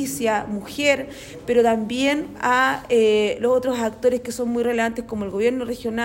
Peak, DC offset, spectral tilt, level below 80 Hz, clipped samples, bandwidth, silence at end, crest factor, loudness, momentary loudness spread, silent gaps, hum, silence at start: -6 dBFS; under 0.1%; -4 dB/octave; -52 dBFS; under 0.1%; 16.5 kHz; 0 s; 16 dB; -21 LUFS; 8 LU; none; none; 0 s